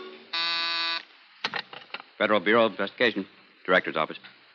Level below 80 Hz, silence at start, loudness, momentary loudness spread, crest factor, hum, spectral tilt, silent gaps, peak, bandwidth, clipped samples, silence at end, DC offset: -76 dBFS; 0 s; -26 LUFS; 17 LU; 20 dB; none; -5 dB/octave; none; -8 dBFS; 7.2 kHz; under 0.1%; 0.25 s; under 0.1%